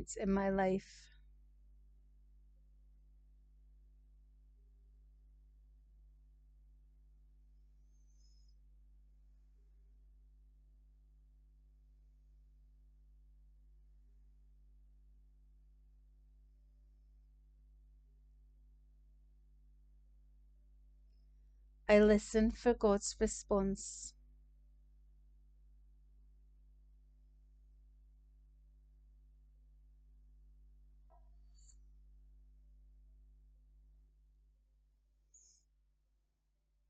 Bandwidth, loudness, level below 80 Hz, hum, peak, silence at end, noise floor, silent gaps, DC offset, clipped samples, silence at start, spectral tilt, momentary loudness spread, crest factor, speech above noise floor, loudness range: 8.8 kHz; -34 LUFS; -58 dBFS; none; -16 dBFS; 12.8 s; -80 dBFS; none; under 0.1%; under 0.1%; 0 s; -5.5 dB/octave; 21 LU; 26 dB; 47 dB; 14 LU